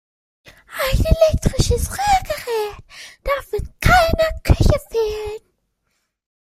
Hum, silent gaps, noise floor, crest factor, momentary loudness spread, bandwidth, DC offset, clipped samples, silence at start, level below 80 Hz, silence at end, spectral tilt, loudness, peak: none; none; -71 dBFS; 18 dB; 15 LU; 16 kHz; under 0.1%; under 0.1%; 0.7 s; -26 dBFS; 1.1 s; -5 dB/octave; -19 LUFS; -2 dBFS